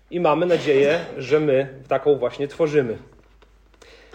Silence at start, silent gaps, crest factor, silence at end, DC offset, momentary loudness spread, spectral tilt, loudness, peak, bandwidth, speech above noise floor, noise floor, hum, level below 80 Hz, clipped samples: 0.1 s; none; 16 dB; 1.1 s; under 0.1%; 7 LU; -6.5 dB/octave; -21 LUFS; -6 dBFS; 8.8 kHz; 33 dB; -53 dBFS; none; -56 dBFS; under 0.1%